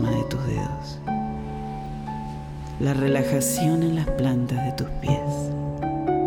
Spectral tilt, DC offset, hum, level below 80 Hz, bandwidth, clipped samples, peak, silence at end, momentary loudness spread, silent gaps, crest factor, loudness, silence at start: -6 dB/octave; under 0.1%; none; -38 dBFS; 16.5 kHz; under 0.1%; -10 dBFS; 0 s; 11 LU; none; 16 dB; -26 LUFS; 0 s